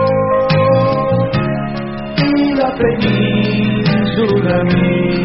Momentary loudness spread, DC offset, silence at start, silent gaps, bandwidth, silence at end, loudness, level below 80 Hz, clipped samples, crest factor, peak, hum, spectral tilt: 5 LU; under 0.1%; 0 s; none; 5.8 kHz; 0 s; -14 LUFS; -36 dBFS; under 0.1%; 12 dB; -2 dBFS; none; -6 dB/octave